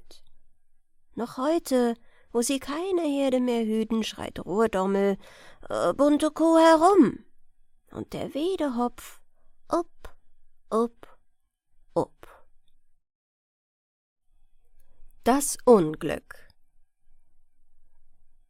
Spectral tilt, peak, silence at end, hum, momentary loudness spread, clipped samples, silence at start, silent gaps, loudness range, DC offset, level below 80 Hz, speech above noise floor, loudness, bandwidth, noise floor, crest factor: -5 dB/octave; -6 dBFS; 0.2 s; none; 17 LU; under 0.1%; 0.05 s; 13.15-14.16 s; 12 LU; under 0.1%; -54 dBFS; 39 dB; -25 LUFS; 16.5 kHz; -64 dBFS; 22 dB